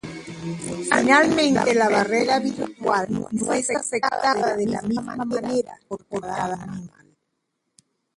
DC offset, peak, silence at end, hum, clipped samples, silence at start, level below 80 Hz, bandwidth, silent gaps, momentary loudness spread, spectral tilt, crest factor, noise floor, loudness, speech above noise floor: under 0.1%; -2 dBFS; 1.3 s; none; under 0.1%; 0.05 s; -58 dBFS; 11.5 kHz; none; 15 LU; -4 dB/octave; 22 dB; -76 dBFS; -22 LUFS; 54 dB